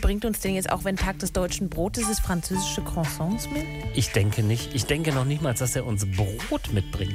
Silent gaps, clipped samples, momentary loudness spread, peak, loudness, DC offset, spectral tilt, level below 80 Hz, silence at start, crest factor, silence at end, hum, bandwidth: none; under 0.1%; 4 LU; -8 dBFS; -26 LUFS; under 0.1%; -5 dB/octave; -34 dBFS; 0 s; 16 dB; 0 s; none; 16 kHz